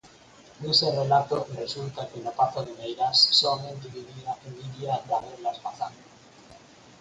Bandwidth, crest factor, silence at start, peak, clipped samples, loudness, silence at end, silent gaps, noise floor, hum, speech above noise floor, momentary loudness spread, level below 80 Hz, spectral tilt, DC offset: 9.4 kHz; 22 dB; 0.05 s; -6 dBFS; under 0.1%; -25 LUFS; 0.4 s; none; -52 dBFS; none; 25 dB; 18 LU; -66 dBFS; -4 dB/octave; under 0.1%